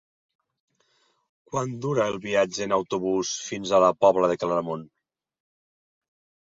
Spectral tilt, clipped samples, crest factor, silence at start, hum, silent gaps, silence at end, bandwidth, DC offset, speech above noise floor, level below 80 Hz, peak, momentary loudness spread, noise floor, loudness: -4.5 dB/octave; under 0.1%; 22 dB; 1.5 s; none; none; 1.65 s; 7.8 kHz; under 0.1%; 44 dB; -64 dBFS; -6 dBFS; 11 LU; -68 dBFS; -24 LUFS